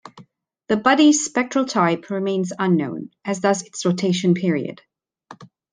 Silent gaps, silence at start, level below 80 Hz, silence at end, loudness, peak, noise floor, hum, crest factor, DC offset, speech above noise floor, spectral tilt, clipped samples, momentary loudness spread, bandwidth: none; 0.05 s; -68 dBFS; 0.25 s; -20 LUFS; -2 dBFS; -51 dBFS; none; 20 dB; under 0.1%; 31 dB; -5 dB/octave; under 0.1%; 11 LU; 10 kHz